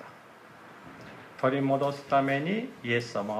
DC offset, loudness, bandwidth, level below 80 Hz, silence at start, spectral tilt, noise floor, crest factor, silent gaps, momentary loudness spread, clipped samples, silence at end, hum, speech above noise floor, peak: under 0.1%; -28 LUFS; 14 kHz; -72 dBFS; 0 s; -6.5 dB/octave; -51 dBFS; 18 dB; none; 22 LU; under 0.1%; 0 s; none; 23 dB; -12 dBFS